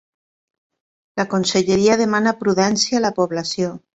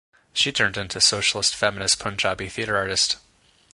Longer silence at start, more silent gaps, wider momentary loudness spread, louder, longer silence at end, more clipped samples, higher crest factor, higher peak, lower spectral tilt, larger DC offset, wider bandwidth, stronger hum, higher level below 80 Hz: first, 1.15 s vs 0.35 s; neither; about the same, 8 LU vs 7 LU; first, -18 LUFS vs -21 LUFS; second, 0.2 s vs 0.55 s; neither; about the same, 18 dB vs 20 dB; about the same, -2 dBFS vs -4 dBFS; first, -4 dB/octave vs -1 dB/octave; neither; second, 8.2 kHz vs 11.5 kHz; neither; second, -56 dBFS vs -50 dBFS